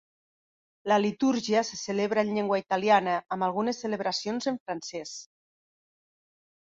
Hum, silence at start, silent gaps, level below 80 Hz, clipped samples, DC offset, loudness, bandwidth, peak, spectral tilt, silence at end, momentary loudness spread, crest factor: none; 0.85 s; 4.60-4.66 s; -72 dBFS; under 0.1%; under 0.1%; -28 LUFS; 7.8 kHz; -10 dBFS; -4.5 dB/octave; 1.4 s; 12 LU; 20 dB